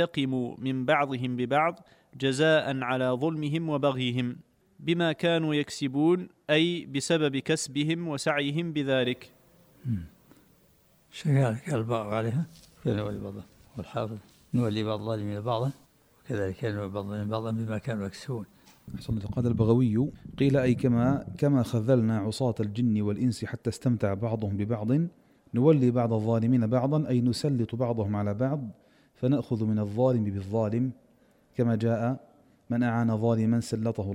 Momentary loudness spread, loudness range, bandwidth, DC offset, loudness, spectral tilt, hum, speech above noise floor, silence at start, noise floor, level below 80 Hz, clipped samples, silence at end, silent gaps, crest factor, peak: 10 LU; 6 LU; 14.5 kHz; under 0.1%; -28 LUFS; -6.5 dB/octave; none; 36 dB; 0 s; -63 dBFS; -58 dBFS; under 0.1%; 0 s; none; 18 dB; -10 dBFS